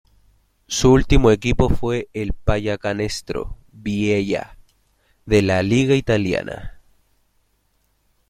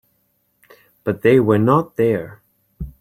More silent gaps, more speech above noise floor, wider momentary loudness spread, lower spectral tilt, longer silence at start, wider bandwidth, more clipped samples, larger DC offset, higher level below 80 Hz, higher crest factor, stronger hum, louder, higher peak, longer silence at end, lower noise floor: neither; about the same, 47 dB vs 50 dB; second, 14 LU vs 21 LU; second, -6 dB/octave vs -9 dB/octave; second, 0.7 s vs 1.05 s; second, 14 kHz vs 16 kHz; neither; neither; first, -30 dBFS vs -44 dBFS; about the same, 18 dB vs 18 dB; neither; about the same, -19 LUFS vs -17 LUFS; about the same, -2 dBFS vs -2 dBFS; first, 1.6 s vs 0.1 s; about the same, -65 dBFS vs -65 dBFS